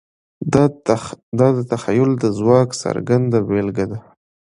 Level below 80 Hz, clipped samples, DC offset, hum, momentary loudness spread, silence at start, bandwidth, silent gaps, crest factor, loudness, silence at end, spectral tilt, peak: -48 dBFS; under 0.1%; under 0.1%; none; 10 LU; 0.4 s; 11 kHz; 1.23-1.32 s; 18 dB; -18 LUFS; 0.5 s; -7 dB/octave; 0 dBFS